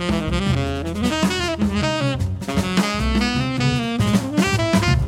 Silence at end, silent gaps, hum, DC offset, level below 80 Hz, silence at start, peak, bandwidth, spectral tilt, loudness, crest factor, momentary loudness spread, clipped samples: 0 s; none; none; under 0.1%; -30 dBFS; 0 s; -4 dBFS; 16 kHz; -5.5 dB/octave; -20 LUFS; 16 dB; 4 LU; under 0.1%